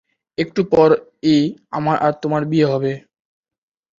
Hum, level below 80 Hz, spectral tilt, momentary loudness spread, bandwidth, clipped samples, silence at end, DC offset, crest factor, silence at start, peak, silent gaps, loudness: none; -54 dBFS; -7.5 dB/octave; 11 LU; 7.4 kHz; under 0.1%; 1 s; under 0.1%; 16 dB; 0.4 s; -2 dBFS; none; -18 LUFS